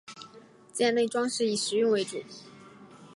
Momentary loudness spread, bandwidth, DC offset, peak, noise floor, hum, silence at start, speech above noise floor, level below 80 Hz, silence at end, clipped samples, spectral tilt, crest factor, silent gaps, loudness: 21 LU; 11.5 kHz; under 0.1%; -14 dBFS; -53 dBFS; none; 0.1 s; 26 dB; -80 dBFS; 0 s; under 0.1%; -3 dB/octave; 16 dB; none; -27 LUFS